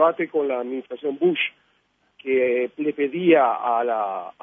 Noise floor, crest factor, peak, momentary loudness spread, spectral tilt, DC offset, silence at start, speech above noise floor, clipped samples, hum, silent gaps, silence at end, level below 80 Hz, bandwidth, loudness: -66 dBFS; 18 dB; -4 dBFS; 11 LU; -8.5 dB/octave; under 0.1%; 0 s; 44 dB; under 0.1%; none; none; 0.1 s; -78 dBFS; 3.7 kHz; -22 LUFS